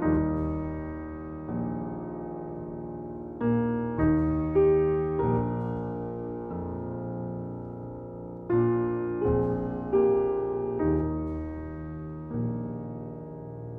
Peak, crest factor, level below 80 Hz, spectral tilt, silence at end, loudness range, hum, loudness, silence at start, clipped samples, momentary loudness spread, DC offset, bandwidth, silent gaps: -14 dBFS; 16 dB; -44 dBFS; -12 dB/octave; 0 s; 6 LU; none; -29 LUFS; 0 s; under 0.1%; 14 LU; under 0.1%; 3.4 kHz; none